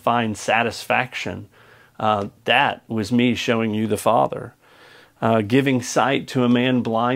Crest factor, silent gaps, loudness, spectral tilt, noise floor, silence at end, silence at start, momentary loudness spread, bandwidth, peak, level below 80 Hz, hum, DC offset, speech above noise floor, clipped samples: 20 dB; none; -20 LUFS; -5 dB/octave; -49 dBFS; 0 s; 0.05 s; 9 LU; 16 kHz; 0 dBFS; -62 dBFS; none; under 0.1%; 29 dB; under 0.1%